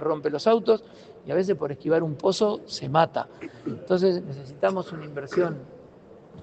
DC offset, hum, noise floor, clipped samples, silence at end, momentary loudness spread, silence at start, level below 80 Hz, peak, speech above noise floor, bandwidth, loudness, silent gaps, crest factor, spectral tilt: under 0.1%; none; -49 dBFS; under 0.1%; 0 s; 13 LU; 0 s; -66 dBFS; -4 dBFS; 24 dB; 8.8 kHz; -25 LUFS; none; 20 dB; -6 dB/octave